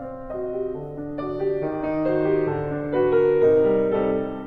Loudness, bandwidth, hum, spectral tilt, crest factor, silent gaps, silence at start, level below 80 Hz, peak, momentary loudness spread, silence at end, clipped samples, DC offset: -23 LUFS; 4.6 kHz; none; -10 dB/octave; 14 dB; none; 0 s; -48 dBFS; -8 dBFS; 13 LU; 0 s; under 0.1%; under 0.1%